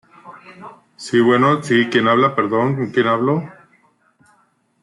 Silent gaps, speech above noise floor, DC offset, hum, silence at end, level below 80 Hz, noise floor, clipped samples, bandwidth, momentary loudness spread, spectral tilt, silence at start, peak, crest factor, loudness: none; 44 dB; under 0.1%; none; 1.3 s; -64 dBFS; -60 dBFS; under 0.1%; 11.5 kHz; 21 LU; -6.5 dB/octave; 0.25 s; -2 dBFS; 16 dB; -16 LUFS